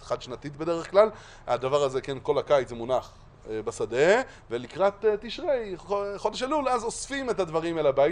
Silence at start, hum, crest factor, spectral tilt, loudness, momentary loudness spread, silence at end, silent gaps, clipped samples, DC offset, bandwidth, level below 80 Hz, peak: 0 s; none; 20 dB; -4.5 dB/octave; -27 LUFS; 11 LU; 0 s; none; under 0.1%; under 0.1%; 11 kHz; -52 dBFS; -6 dBFS